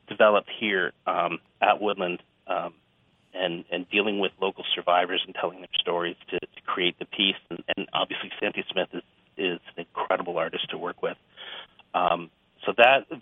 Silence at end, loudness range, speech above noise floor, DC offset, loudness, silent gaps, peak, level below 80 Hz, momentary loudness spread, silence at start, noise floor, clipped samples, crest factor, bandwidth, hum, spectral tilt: 0 s; 4 LU; 39 dB; under 0.1%; -26 LUFS; none; -2 dBFS; -74 dBFS; 14 LU; 0.1 s; -65 dBFS; under 0.1%; 24 dB; 3.9 kHz; none; -6.5 dB/octave